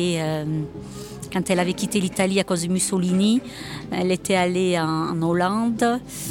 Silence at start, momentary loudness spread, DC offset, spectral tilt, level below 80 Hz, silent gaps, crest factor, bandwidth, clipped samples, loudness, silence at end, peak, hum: 0 s; 10 LU; under 0.1%; -5 dB/octave; -52 dBFS; none; 16 dB; 17 kHz; under 0.1%; -22 LUFS; 0 s; -8 dBFS; none